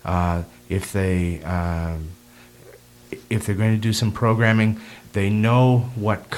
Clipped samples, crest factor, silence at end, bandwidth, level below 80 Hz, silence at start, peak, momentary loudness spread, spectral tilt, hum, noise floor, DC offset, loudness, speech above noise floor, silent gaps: under 0.1%; 20 dB; 0 s; 15.5 kHz; -44 dBFS; 0.05 s; -2 dBFS; 12 LU; -6.5 dB/octave; none; -47 dBFS; under 0.1%; -21 LUFS; 27 dB; none